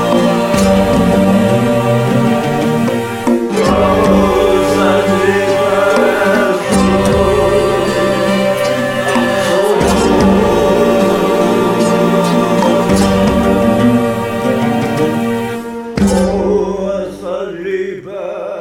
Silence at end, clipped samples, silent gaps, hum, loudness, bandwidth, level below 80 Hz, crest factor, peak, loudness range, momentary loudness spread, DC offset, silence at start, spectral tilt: 0 s; under 0.1%; none; none; -12 LUFS; 16.5 kHz; -32 dBFS; 12 dB; 0 dBFS; 4 LU; 8 LU; under 0.1%; 0 s; -6 dB/octave